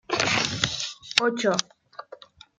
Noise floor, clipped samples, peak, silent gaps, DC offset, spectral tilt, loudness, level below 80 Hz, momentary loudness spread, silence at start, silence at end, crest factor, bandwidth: -48 dBFS; under 0.1%; -2 dBFS; none; under 0.1%; -2.5 dB/octave; -24 LUFS; -58 dBFS; 21 LU; 0.1 s; 0.4 s; 26 dB; 9.8 kHz